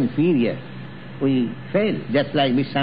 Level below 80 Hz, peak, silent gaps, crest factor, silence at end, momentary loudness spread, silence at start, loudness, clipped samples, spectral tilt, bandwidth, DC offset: -60 dBFS; -6 dBFS; none; 14 dB; 0 s; 16 LU; 0 s; -21 LUFS; under 0.1%; -10.5 dB/octave; 5.2 kHz; 0.8%